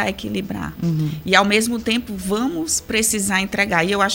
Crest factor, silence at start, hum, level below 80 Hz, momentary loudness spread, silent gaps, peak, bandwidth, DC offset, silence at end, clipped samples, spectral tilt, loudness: 20 dB; 0 s; none; -44 dBFS; 9 LU; none; 0 dBFS; 17 kHz; under 0.1%; 0 s; under 0.1%; -3.5 dB/octave; -19 LUFS